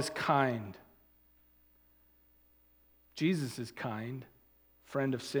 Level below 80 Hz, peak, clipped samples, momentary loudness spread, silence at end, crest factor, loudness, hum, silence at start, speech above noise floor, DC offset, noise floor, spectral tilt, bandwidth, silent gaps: -72 dBFS; -14 dBFS; under 0.1%; 20 LU; 0 s; 24 dB; -35 LUFS; 60 Hz at -60 dBFS; 0 s; 33 dB; under 0.1%; -67 dBFS; -5.5 dB/octave; over 20 kHz; none